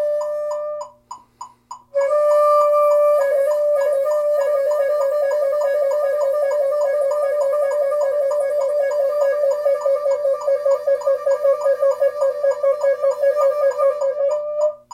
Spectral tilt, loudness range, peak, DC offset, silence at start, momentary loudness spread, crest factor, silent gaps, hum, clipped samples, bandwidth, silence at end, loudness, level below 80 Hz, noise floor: -1.5 dB/octave; 2 LU; -6 dBFS; under 0.1%; 0 s; 6 LU; 12 dB; none; none; under 0.1%; 14 kHz; 0.15 s; -18 LUFS; -70 dBFS; -41 dBFS